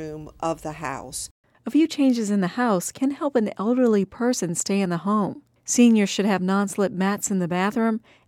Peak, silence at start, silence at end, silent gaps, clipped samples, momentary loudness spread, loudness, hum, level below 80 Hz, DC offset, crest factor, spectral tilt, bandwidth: -6 dBFS; 0 s; 0.3 s; 1.31-1.44 s; under 0.1%; 11 LU; -23 LUFS; none; -60 dBFS; under 0.1%; 16 dB; -5 dB/octave; 16 kHz